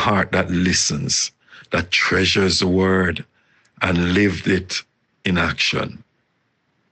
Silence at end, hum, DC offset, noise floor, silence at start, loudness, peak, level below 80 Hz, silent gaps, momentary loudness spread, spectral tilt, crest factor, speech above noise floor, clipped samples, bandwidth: 1 s; none; under 0.1%; -68 dBFS; 0 s; -19 LUFS; -2 dBFS; -44 dBFS; none; 9 LU; -4 dB/octave; 18 dB; 49 dB; under 0.1%; 9 kHz